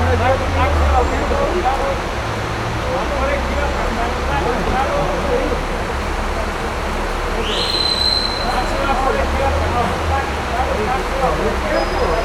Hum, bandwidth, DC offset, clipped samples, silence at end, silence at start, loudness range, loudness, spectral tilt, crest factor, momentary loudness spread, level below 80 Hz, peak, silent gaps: none; 15 kHz; under 0.1%; under 0.1%; 0 s; 0 s; 2 LU; -18 LUFS; -5 dB/octave; 14 dB; 6 LU; -24 dBFS; -2 dBFS; none